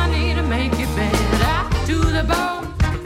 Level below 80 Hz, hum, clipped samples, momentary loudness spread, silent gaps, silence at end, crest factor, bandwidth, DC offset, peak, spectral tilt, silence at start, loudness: -22 dBFS; none; under 0.1%; 3 LU; none; 0 s; 12 dB; 16 kHz; under 0.1%; -6 dBFS; -5.5 dB/octave; 0 s; -20 LUFS